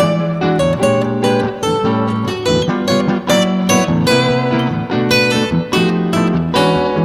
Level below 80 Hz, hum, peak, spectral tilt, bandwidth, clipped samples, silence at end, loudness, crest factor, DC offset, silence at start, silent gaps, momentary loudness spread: -42 dBFS; none; -2 dBFS; -5.5 dB/octave; 15 kHz; under 0.1%; 0 s; -14 LUFS; 12 dB; under 0.1%; 0 s; none; 4 LU